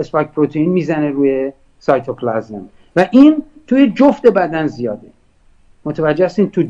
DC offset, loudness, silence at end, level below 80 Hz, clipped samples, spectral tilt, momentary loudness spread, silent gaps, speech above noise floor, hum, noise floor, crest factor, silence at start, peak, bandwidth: under 0.1%; -14 LUFS; 0 s; -50 dBFS; 0.3%; -8 dB/octave; 14 LU; none; 36 dB; none; -50 dBFS; 14 dB; 0 s; 0 dBFS; 7.4 kHz